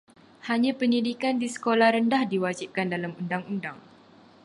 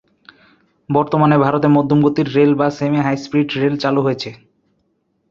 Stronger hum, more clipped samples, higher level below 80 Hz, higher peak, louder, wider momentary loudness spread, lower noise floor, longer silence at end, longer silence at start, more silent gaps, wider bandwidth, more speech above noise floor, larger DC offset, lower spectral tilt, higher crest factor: neither; neither; second, -74 dBFS vs -56 dBFS; second, -8 dBFS vs 0 dBFS; second, -26 LUFS vs -16 LUFS; first, 12 LU vs 6 LU; second, -54 dBFS vs -65 dBFS; second, 0.65 s vs 0.95 s; second, 0.45 s vs 0.9 s; neither; first, 11.5 kHz vs 7.2 kHz; second, 28 dB vs 50 dB; neither; second, -5.5 dB/octave vs -8 dB/octave; about the same, 20 dB vs 16 dB